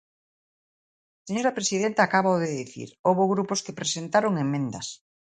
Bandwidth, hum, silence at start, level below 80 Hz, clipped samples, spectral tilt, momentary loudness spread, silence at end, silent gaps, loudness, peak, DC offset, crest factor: 9.6 kHz; none; 1.25 s; -70 dBFS; under 0.1%; -4.5 dB/octave; 11 LU; 0.3 s; 2.99-3.04 s; -25 LUFS; -6 dBFS; under 0.1%; 20 dB